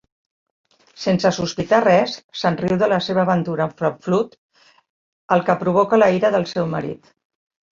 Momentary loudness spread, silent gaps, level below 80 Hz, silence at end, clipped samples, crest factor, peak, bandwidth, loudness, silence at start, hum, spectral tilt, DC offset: 10 LU; 2.24-2.29 s, 4.38-4.49 s, 4.90-5.29 s; -56 dBFS; 0.8 s; under 0.1%; 18 dB; -2 dBFS; 7.4 kHz; -19 LUFS; 1 s; none; -6 dB/octave; under 0.1%